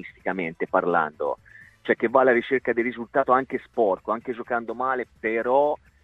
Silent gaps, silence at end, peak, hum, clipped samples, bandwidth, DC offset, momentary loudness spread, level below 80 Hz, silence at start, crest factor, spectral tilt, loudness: none; 0.3 s; -4 dBFS; none; under 0.1%; 5.6 kHz; under 0.1%; 10 LU; -62 dBFS; 0 s; 20 dB; -7.5 dB/octave; -24 LUFS